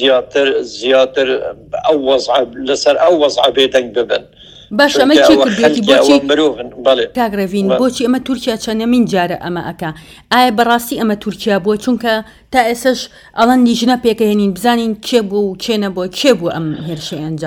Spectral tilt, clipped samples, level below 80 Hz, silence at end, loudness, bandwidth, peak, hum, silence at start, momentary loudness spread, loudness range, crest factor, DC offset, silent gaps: -4.5 dB/octave; 0.3%; -46 dBFS; 0 s; -13 LUFS; 19 kHz; 0 dBFS; none; 0 s; 10 LU; 4 LU; 12 dB; under 0.1%; none